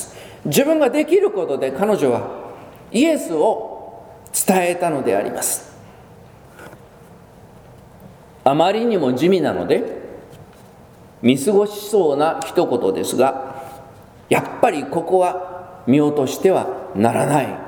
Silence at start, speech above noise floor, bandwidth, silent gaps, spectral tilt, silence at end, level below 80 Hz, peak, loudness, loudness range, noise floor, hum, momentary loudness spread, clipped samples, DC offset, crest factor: 0 s; 27 dB; over 20 kHz; none; -5 dB/octave; 0 s; -58 dBFS; 0 dBFS; -18 LUFS; 4 LU; -44 dBFS; none; 15 LU; under 0.1%; under 0.1%; 20 dB